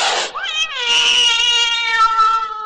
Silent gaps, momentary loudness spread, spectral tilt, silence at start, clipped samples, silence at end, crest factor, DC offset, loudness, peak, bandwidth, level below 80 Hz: none; 8 LU; 3 dB/octave; 0 s; under 0.1%; 0 s; 12 dB; under 0.1%; -13 LUFS; -4 dBFS; 11 kHz; -50 dBFS